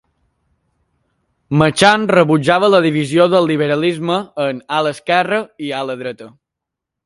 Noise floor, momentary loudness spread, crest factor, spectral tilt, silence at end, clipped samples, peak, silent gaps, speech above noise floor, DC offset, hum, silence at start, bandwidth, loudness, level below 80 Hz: -82 dBFS; 12 LU; 16 dB; -5.5 dB/octave; 0.75 s; under 0.1%; 0 dBFS; none; 67 dB; under 0.1%; none; 1.5 s; 11.5 kHz; -15 LUFS; -54 dBFS